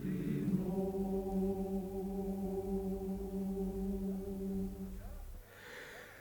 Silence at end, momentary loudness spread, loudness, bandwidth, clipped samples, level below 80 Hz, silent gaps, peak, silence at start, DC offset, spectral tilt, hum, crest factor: 0 s; 14 LU; -39 LUFS; over 20 kHz; under 0.1%; -50 dBFS; none; -22 dBFS; 0 s; under 0.1%; -8.5 dB/octave; none; 18 dB